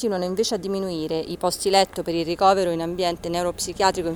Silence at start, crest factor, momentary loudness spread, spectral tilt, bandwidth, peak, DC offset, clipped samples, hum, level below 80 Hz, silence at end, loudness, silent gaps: 0 s; 20 dB; 7 LU; -4 dB/octave; over 20 kHz; -2 dBFS; under 0.1%; under 0.1%; none; -50 dBFS; 0 s; -23 LUFS; none